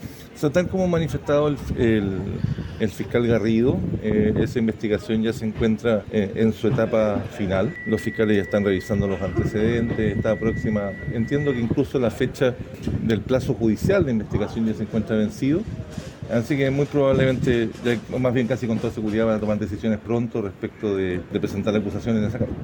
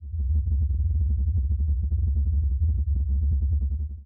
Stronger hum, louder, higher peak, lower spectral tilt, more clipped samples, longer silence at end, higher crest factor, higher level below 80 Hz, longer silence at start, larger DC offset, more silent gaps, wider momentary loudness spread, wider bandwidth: neither; first, -23 LUFS vs -26 LUFS; first, -4 dBFS vs -16 dBFS; second, -7.5 dB/octave vs -19 dB/octave; neither; about the same, 0 s vs 0 s; first, 18 dB vs 8 dB; second, -42 dBFS vs -24 dBFS; about the same, 0 s vs 0 s; neither; neither; first, 6 LU vs 2 LU; first, 19 kHz vs 0.7 kHz